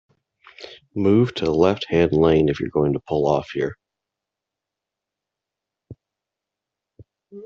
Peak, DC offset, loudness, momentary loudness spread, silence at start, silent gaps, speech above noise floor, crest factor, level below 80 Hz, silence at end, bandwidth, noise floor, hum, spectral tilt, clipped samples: -2 dBFS; under 0.1%; -20 LUFS; 15 LU; 0.6 s; none; 67 dB; 20 dB; -50 dBFS; 0 s; 7.2 kHz; -86 dBFS; none; -6 dB/octave; under 0.1%